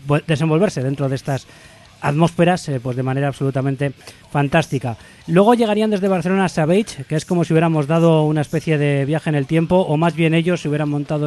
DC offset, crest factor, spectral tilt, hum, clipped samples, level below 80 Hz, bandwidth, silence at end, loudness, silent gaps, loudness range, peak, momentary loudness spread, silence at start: under 0.1%; 18 dB; -7 dB/octave; none; under 0.1%; -50 dBFS; 12.5 kHz; 0 s; -18 LUFS; none; 4 LU; 0 dBFS; 9 LU; 0.05 s